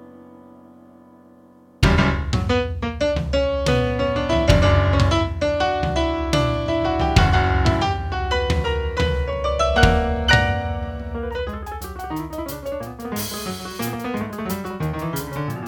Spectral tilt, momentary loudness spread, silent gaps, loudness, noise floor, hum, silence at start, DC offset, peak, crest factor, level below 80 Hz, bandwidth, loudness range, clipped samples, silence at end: -5.5 dB/octave; 12 LU; none; -21 LUFS; -49 dBFS; none; 0 s; under 0.1%; 0 dBFS; 20 dB; -28 dBFS; 19 kHz; 9 LU; under 0.1%; 0 s